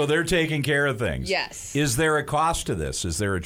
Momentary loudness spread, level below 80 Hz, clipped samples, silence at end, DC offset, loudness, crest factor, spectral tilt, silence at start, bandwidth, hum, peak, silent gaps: 6 LU; -40 dBFS; under 0.1%; 0 s; under 0.1%; -24 LUFS; 14 dB; -4 dB/octave; 0 s; 16 kHz; none; -10 dBFS; none